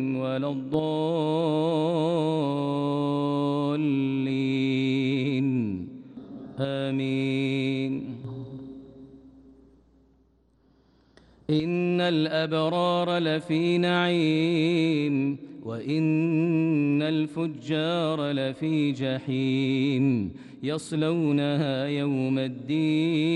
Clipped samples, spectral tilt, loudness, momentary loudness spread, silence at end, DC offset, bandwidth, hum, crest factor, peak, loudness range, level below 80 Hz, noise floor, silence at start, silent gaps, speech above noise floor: under 0.1%; -7.5 dB/octave; -26 LUFS; 10 LU; 0 s; under 0.1%; 11 kHz; none; 14 dB; -12 dBFS; 7 LU; -66 dBFS; -63 dBFS; 0 s; none; 38 dB